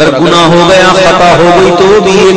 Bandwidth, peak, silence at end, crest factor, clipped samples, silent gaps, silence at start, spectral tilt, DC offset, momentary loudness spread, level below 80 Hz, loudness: 11 kHz; 0 dBFS; 0 s; 4 dB; 8%; none; 0 s; -4.5 dB/octave; under 0.1%; 1 LU; -30 dBFS; -4 LUFS